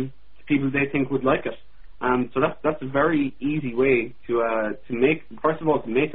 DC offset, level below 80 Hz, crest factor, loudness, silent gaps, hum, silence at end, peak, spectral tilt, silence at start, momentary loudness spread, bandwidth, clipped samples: 1%; -52 dBFS; 18 dB; -23 LUFS; none; none; 0 s; -6 dBFS; -11 dB/octave; 0 s; 6 LU; 4.1 kHz; under 0.1%